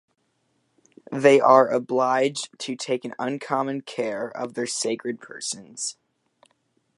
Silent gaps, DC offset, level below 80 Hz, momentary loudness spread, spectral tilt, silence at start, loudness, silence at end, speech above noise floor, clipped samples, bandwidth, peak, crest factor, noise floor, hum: none; under 0.1%; -78 dBFS; 15 LU; -3.5 dB/octave; 1.1 s; -23 LUFS; 1.05 s; 48 dB; under 0.1%; 11.5 kHz; -2 dBFS; 22 dB; -71 dBFS; none